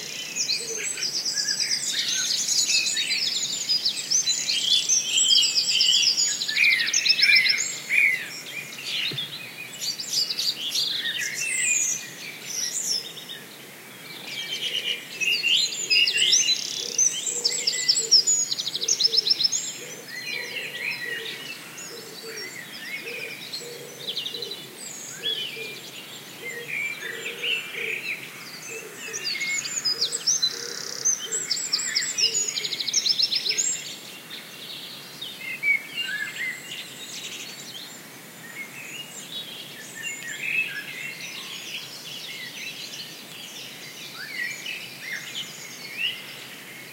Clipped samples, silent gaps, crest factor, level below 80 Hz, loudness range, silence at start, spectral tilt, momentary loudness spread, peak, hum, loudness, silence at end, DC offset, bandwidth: under 0.1%; none; 22 dB; -86 dBFS; 14 LU; 0 s; 1.5 dB/octave; 18 LU; -6 dBFS; none; -23 LUFS; 0 s; under 0.1%; 16 kHz